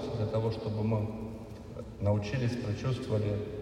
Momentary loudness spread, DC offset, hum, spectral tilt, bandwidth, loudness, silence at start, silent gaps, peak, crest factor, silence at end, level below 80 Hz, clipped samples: 13 LU; under 0.1%; none; -8 dB/octave; 10 kHz; -33 LUFS; 0 s; none; -16 dBFS; 16 dB; 0 s; -52 dBFS; under 0.1%